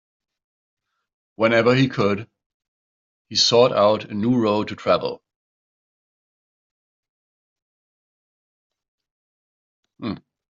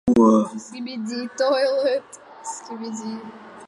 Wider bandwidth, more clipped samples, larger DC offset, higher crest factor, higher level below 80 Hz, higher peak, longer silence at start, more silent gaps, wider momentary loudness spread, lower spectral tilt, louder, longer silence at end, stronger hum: second, 7.6 kHz vs 11.5 kHz; neither; neither; about the same, 22 dB vs 18 dB; second, -64 dBFS vs -56 dBFS; about the same, -2 dBFS vs -4 dBFS; first, 1.4 s vs 0.05 s; first, 2.46-2.60 s, 2.68-3.25 s, 5.36-7.03 s, 7.09-7.56 s, 7.62-8.70 s, 8.88-8.98 s, 9.11-9.83 s vs none; second, 16 LU vs 19 LU; second, -3.5 dB/octave vs -5 dB/octave; first, -19 LUFS vs -22 LUFS; first, 0.4 s vs 0 s; neither